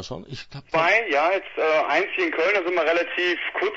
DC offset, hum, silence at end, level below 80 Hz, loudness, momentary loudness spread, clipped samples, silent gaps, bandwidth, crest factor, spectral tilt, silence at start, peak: under 0.1%; none; 0 s; -58 dBFS; -21 LUFS; 13 LU; under 0.1%; none; 7.8 kHz; 16 dB; -4.5 dB/octave; 0 s; -8 dBFS